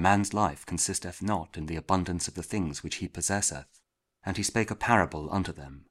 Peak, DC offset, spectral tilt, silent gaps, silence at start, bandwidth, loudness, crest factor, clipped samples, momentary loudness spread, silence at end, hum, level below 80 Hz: -6 dBFS; under 0.1%; -4 dB/octave; none; 0 s; 15.5 kHz; -29 LUFS; 24 dB; under 0.1%; 11 LU; 0.1 s; none; -50 dBFS